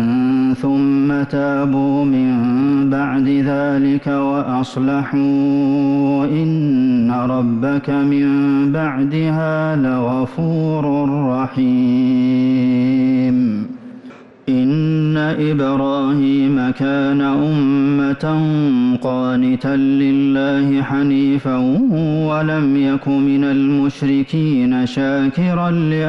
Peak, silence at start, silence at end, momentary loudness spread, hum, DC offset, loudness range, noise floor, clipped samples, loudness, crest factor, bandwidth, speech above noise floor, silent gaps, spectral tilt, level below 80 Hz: -8 dBFS; 0 s; 0 s; 3 LU; none; under 0.1%; 1 LU; -38 dBFS; under 0.1%; -16 LUFS; 6 dB; 6 kHz; 23 dB; none; -9 dB/octave; -50 dBFS